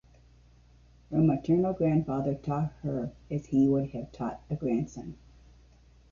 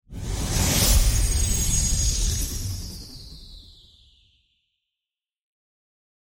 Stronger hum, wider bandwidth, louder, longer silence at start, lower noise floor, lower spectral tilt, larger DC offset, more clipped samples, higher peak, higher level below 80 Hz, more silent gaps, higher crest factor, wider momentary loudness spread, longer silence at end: neither; second, 7.2 kHz vs 16.5 kHz; second, -29 LUFS vs -23 LUFS; first, 1.1 s vs 0.1 s; second, -58 dBFS vs -89 dBFS; first, -9.5 dB/octave vs -3 dB/octave; neither; neither; second, -14 dBFS vs -6 dBFS; second, -54 dBFS vs -28 dBFS; neither; about the same, 16 dB vs 18 dB; second, 12 LU vs 21 LU; second, 1 s vs 2.6 s